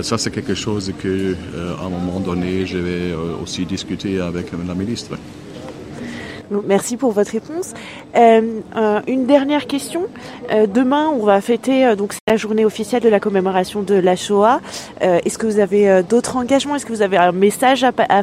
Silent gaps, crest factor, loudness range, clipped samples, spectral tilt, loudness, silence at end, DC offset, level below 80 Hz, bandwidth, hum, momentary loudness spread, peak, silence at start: 12.21-12.27 s; 16 dB; 7 LU; under 0.1%; -5 dB/octave; -17 LUFS; 0 s; under 0.1%; -48 dBFS; 15.5 kHz; none; 12 LU; 0 dBFS; 0 s